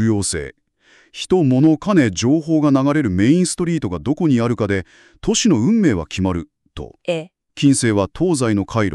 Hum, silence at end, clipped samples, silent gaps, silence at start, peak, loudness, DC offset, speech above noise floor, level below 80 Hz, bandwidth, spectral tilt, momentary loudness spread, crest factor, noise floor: none; 0 s; under 0.1%; none; 0 s; -4 dBFS; -17 LUFS; under 0.1%; 37 dB; -44 dBFS; 12 kHz; -5.5 dB/octave; 12 LU; 14 dB; -54 dBFS